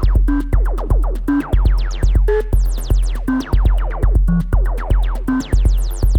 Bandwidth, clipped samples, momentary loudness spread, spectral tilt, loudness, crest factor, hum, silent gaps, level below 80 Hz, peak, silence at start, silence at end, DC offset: 12 kHz; under 0.1%; 3 LU; -7.5 dB/octave; -18 LUFS; 12 dB; none; none; -14 dBFS; -2 dBFS; 0 s; 0 s; under 0.1%